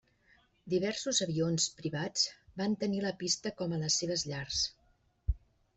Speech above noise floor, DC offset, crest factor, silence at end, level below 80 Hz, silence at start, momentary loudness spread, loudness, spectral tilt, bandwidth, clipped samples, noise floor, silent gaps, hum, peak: 37 dB; under 0.1%; 18 dB; 0.4 s; -48 dBFS; 0.65 s; 8 LU; -33 LUFS; -3.5 dB/octave; 8.4 kHz; under 0.1%; -70 dBFS; none; none; -16 dBFS